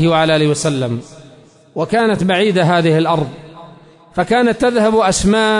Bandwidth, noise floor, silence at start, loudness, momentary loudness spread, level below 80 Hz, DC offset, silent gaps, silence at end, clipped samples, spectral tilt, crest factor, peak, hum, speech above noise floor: 11 kHz; -44 dBFS; 0 s; -14 LUFS; 12 LU; -40 dBFS; under 0.1%; none; 0 s; under 0.1%; -5 dB/octave; 12 dB; -4 dBFS; none; 30 dB